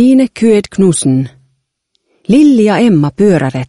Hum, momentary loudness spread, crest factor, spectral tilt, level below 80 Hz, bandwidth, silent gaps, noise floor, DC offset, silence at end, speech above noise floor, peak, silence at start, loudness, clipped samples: none; 7 LU; 10 dB; -6.5 dB/octave; -46 dBFS; 11.5 kHz; none; -65 dBFS; under 0.1%; 0.05 s; 56 dB; 0 dBFS; 0 s; -10 LUFS; under 0.1%